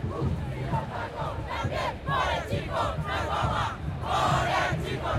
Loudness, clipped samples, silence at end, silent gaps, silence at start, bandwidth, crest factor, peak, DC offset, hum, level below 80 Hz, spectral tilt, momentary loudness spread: -29 LUFS; under 0.1%; 0 s; none; 0 s; 15 kHz; 16 dB; -12 dBFS; under 0.1%; none; -40 dBFS; -5.5 dB/octave; 7 LU